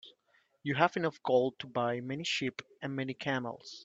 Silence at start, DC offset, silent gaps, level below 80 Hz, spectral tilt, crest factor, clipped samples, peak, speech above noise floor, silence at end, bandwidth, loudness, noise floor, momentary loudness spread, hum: 0.05 s; under 0.1%; none; -76 dBFS; -5 dB/octave; 24 dB; under 0.1%; -10 dBFS; 39 dB; 0 s; 8 kHz; -33 LUFS; -72 dBFS; 10 LU; none